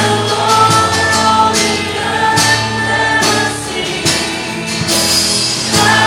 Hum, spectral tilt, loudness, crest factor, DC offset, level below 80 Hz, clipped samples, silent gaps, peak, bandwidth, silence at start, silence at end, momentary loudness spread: none; -2.5 dB/octave; -12 LUFS; 12 dB; under 0.1%; -40 dBFS; under 0.1%; none; 0 dBFS; 17.5 kHz; 0 s; 0 s; 7 LU